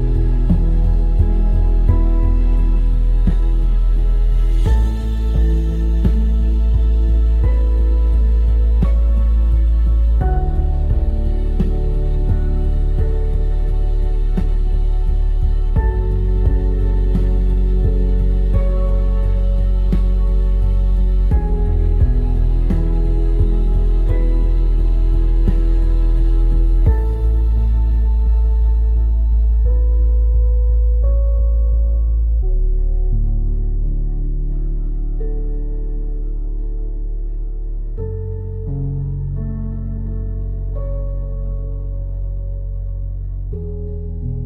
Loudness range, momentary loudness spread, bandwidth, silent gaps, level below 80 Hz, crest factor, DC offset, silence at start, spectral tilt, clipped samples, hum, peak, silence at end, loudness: 9 LU; 9 LU; 3.7 kHz; none; -14 dBFS; 12 dB; under 0.1%; 0 s; -10 dB/octave; under 0.1%; none; -4 dBFS; 0 s; -19 LUFS